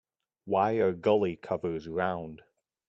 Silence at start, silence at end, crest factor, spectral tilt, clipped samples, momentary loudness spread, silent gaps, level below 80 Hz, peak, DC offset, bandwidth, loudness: 0.45 s; 0.5 s; 18 dB; -8 dB/octave; under 0.1%; 8 LU; none; -66 dBFS; -12 dBFS; under 0.1%; 7.4 kHz; -29 LUFS